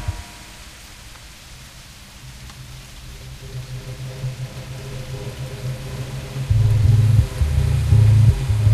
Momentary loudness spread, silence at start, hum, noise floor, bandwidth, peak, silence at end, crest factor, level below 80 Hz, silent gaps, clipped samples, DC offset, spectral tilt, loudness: 24 LU; 0 s; none; -41 dBFS; 13.5 kHz; -4 dBFS; 0 s; 16 dB; -28 dBFS; none; under 0.1%; under 0.1%; -6.5 dB/octave; -20 LUFS